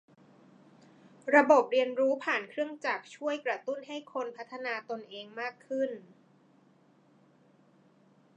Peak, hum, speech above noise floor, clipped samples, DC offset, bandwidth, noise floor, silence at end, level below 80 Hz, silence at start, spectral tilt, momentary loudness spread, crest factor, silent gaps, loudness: -10 dBFS; none; 33 dB; under 0.1%; under 0.1%; 8.8 kHz; -64 dBFS; 2.35 s; under -90 dBFS; 1.25 s; -4 dB/octave; 16 LU; 24 dB; none; -30 LUFS